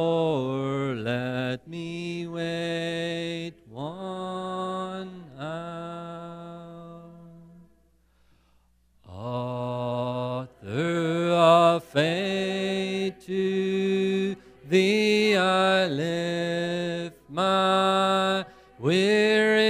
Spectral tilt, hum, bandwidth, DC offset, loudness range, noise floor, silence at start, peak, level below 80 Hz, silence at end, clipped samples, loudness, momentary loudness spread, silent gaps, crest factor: -5.5 dB/octave; none; 15.5 kHz; under 0.1%; 16 LU; -63 dBFS; 0 s; -6 dBFS; -66 dBFS; 0 s; under 0.1%; -25 LUFS; 17 LU; none; 20 dB